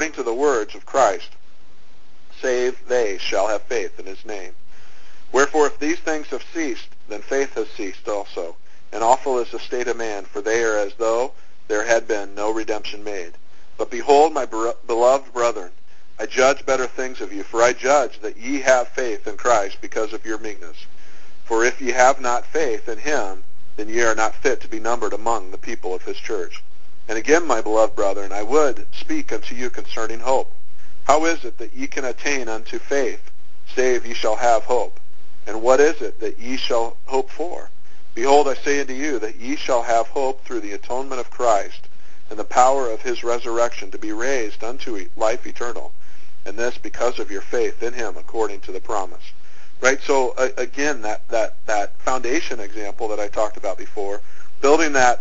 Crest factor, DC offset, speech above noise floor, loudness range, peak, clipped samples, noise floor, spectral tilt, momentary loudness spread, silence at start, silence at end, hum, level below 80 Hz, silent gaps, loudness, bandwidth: 22 dB; 10%; 34 dB; 4 LU; 0 dBFS; under 0.1%; -54 dBFS; -2.5 dB/octave; 14 LU; 0 s; 0 s; none; -52 dBFS; none; -22 LUFS; 8 kHz